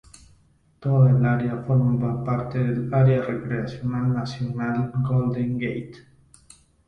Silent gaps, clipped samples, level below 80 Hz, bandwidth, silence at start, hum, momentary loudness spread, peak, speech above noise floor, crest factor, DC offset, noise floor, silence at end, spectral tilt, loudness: none; under 0.1%; -52 dBFS; 9.6 kHz; 0.8 s; none; 10 LU; -8 dBFS; 37 dB; 16 dB; under 0.1%; -59 dBFS; 0.85 s; -9 dB/octave; -23 LUFS